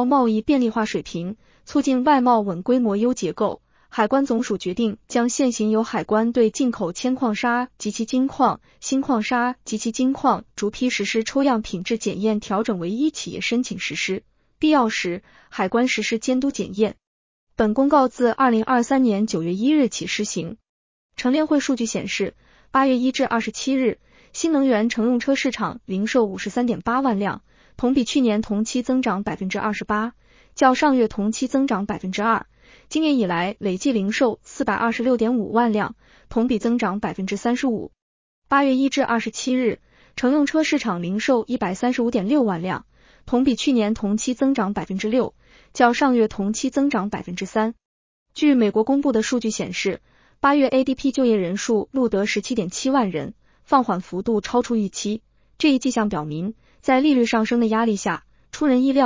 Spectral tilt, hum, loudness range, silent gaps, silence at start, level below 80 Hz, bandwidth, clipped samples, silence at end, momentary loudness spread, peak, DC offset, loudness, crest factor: -5 dB/octave; none; 2 LU; 17.07-17.47 s, 20.69-21.10 s, 38.02-38.42 s, 47.85-48.26 s; 0 s; -54 dBFS; 7.6 kHz; under 0.1%; 0 s; 8 LU; -4 dBFS; under 0.1%; -21 LUFS; 18 dB